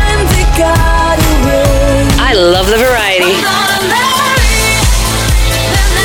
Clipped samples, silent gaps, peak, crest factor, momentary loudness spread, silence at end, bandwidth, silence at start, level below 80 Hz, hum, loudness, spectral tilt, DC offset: under 0.1%; none; 0 dBFS; 8 dB; 3 LU; 0 s; 19 kHz; 0 s; -14 dBFS; none; -9 LUFS; -4 dB/octave; under 0.1%